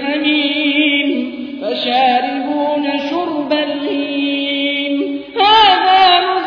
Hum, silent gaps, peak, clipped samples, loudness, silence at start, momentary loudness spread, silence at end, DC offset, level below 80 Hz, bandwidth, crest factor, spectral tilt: none; none; 0 dBFS; under 0.1%; -14 LUFS; 0 s; 10 LU; 0 s; under 0.1%; -56 dBFS; 5.4 kHz; 14 dB; -4.5 dB/octave